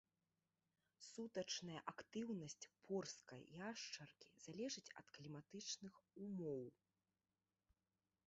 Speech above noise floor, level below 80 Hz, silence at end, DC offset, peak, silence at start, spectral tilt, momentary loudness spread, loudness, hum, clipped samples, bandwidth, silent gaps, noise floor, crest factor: over 37 dB; -88 dBFS; 1.6 s; under 0.1%; -32 dBFS; 1 s; -4 dB/octave; 11 LU; -52 LUFS; none; under 0.1%; 8 kHz; none; under -90 dBFS; 22 dB